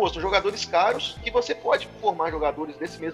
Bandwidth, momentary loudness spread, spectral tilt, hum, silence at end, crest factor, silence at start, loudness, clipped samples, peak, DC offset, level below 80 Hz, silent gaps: 12 kHz; 7 LU; -3.5 dB/octave; none; 0 s; 20 dB; 0 s; -25 LUFS; under 0.1%; -6 dBFS; under 0.1%; -46 dBFS; none